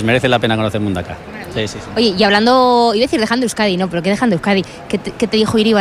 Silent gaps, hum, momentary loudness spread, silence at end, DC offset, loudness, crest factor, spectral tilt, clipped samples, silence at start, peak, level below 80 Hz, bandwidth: none; none; 12 LU; 0 s; under 0.1%; -15 LUFS; 14 dB; -5 dB/octave; under 0.1%; 0 s; -2 dBFS; -44 dBFS; 14.5 kHz